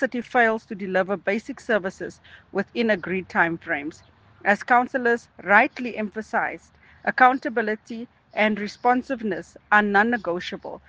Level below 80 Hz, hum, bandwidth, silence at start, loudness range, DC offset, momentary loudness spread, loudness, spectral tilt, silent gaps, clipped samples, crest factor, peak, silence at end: -64 dBFS; none; 9 kHz; 0 s; 4 LU; under 0.1%; 13 LU; -23 LUFS; -5.5 dB/octave; none; under 0.1%; 22 dB; -2 dBFS; 0.1 s